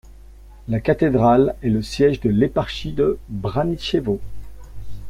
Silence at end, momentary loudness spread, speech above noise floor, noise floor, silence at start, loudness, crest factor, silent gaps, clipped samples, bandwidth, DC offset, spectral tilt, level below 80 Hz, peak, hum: 0 s; 11 LU; 23 dB; -42 dBFS; 0.05 s; -20 LUFS; 16 dB; none; under 0.1%; 14 kHz; under 0.1%; -7.5 dB/octave; -38 dBFS; -4 dBFS; none